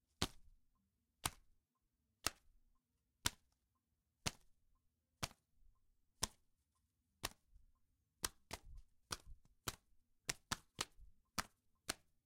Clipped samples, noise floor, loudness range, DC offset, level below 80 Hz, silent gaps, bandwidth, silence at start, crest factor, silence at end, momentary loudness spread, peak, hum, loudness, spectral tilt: under 0.1%; -87 dBFS; 3 LU; under 0.1%; -64 dBFS; none; 16 kHz; 0.2 s; 40 dB; 0.3 s; 11 LU; -12 dBFS; none; -48 LUFS; -1.5 dB/octave